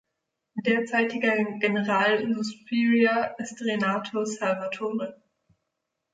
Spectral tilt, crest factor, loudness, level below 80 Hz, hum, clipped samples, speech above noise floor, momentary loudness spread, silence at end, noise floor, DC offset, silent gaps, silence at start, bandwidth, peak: -5 dB/octave; 16 dB; -25 LUFS; -74 dBFS; none; under 0.1%; 56 dB; 9 LU; 1 s; -82 dBFS; under 0.1%; none; 0.55 s; 9.2 kHz; -10 dBFS